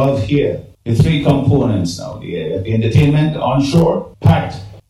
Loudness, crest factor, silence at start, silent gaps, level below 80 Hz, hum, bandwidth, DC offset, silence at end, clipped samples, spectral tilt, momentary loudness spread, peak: -15 LUFS; 14 dB; 0 s; none; -36 dBFS; none; 12 kHz; under 0.1%; 0.1 s; under 0.1%; -7.5 dB/octave; 10 LU; 0 dBFS